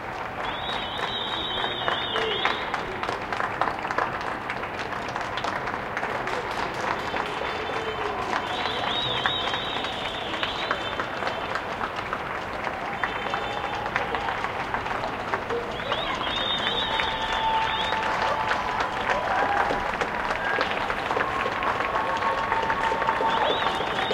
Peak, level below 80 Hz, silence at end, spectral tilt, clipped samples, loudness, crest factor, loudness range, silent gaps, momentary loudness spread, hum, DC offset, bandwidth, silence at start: -4 dBFS; -48 dBFS; 0 s; -3.5 dB/octave; under 0.1%; -26 LUFS; 22 dB; 4 LU; none; 6 LU; none; under 0.1%; 16.5 kHz; 0 s